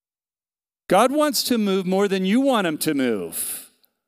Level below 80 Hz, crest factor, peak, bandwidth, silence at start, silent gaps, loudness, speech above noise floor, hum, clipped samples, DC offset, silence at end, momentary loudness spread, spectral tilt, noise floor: -66 dBFS; 18 dB; -4 dBFS; 16 kHz; 0.9 s; none; -21 LUFS; over 70 dB; none; under 0.1%; under 0.1%; 0.45 s; 8 LU; -4.5 dB/octave; under -90 dBFS